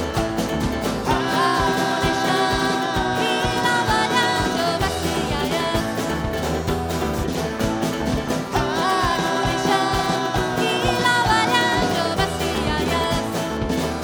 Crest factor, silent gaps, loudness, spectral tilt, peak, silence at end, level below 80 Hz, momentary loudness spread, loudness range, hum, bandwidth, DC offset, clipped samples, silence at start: 16 dB; none; -21 LUFS; -4.5 dB/octave; -4 dBFS; 0 s; -36 dBFS; 6 LU; 4 LU; none; over 20 kHz; under 0.1%; under 0.1%; 0 s